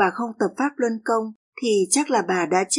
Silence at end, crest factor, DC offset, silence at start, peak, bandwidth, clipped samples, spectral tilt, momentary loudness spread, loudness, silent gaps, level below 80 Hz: 0 s; 16 dB; under 0.1%; 0 s; -6 dBFS; 11.5 kHz; under 0.1%; -3 dB/octave; 6 LU; -22 LUFS; 1.35-1.53 s; -78 dBFS